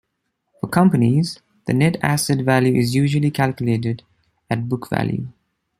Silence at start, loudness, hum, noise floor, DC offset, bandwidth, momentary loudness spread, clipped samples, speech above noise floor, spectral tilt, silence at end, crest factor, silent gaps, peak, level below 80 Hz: 0.65 s; -19 LUFS; none; -74 dBFS; under 0.1%; 15.5 kHz; 11 LU; under 0.1%; 56 dB; -6.5 dB/octave; 0.5 s; 18 dB; none; -2 dBFS; -54 dBFS